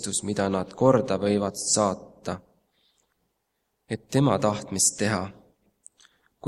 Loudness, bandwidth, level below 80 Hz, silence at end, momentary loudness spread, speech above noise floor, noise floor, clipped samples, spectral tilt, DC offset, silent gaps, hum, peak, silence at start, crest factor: -24 LUFS; 14.5 kHz; -62 dBFS; 0 s; 14 LU; 53 dB; -77 dBFS; under 0.1%; -4.5 dB/octave; under 0.1%; none; none; -6 dBFS; 0 s; 22 dB